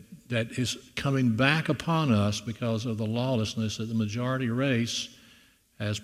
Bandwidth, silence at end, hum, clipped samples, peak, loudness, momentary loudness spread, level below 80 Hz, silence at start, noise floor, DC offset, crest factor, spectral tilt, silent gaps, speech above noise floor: 15 kHz; 0 s; none; under 0.1%; -6 dBFS; -28 LUFS; 8 LU; -60 dBFS; 0.1 s; -60 dBFS; under 0.1%; 22 dB; -5.5 dB/octave; none; 32 dB